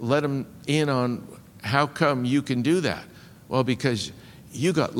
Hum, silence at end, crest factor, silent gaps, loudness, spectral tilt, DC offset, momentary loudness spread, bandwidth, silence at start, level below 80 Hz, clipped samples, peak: none; 0 s; 22 dB; none; -25 LUFS; -6 dB/octave; under 0.1%; 12 LU; 17 kHz; 0 s; -60 dBFS; under 0.1%; -4 dBFS